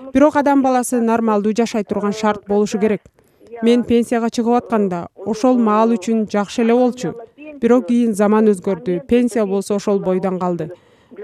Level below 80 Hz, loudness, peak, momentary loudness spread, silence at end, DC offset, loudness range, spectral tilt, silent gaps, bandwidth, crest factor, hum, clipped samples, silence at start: -52 dBFS; -17 LUFS; 0 dBFS; 8 LU; 0 s; under 0.1%; 2 LU; -6 dB/octave; none; 13.5 kHz; 16 dB; none; under 0.1%; 0 s